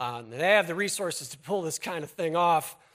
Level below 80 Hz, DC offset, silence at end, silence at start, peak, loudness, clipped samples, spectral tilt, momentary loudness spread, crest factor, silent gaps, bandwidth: -74 dBFS; under 0.1%; 0.2 s; 0 s; -8 dBFS; -27 LUFS; under 0.1%; -3 dB/octave; 11 LU; 20 dB; none; 16 kHz